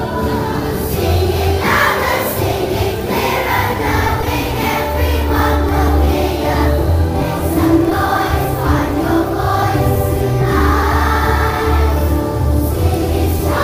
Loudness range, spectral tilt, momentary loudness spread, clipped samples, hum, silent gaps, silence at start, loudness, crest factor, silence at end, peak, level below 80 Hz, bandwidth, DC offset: 1 LU; -6 dB/octave; 4 LU; under 0.1%; none; none; 0 s; -15 LUFS; 14 dB; 0 s; 0 dBFS; -22 dBFS; 16 kHz; under 0.1%